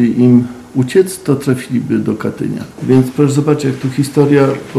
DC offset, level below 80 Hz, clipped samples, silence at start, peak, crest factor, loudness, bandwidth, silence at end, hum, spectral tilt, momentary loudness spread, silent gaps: under 0.1%; -52 dBFS; under 0.1%; 0 s; 0 dBFS; 12 dB; -13 LUFS; 14 kHz; 0 s; none; -7.5 dB/octave; 9 LU; none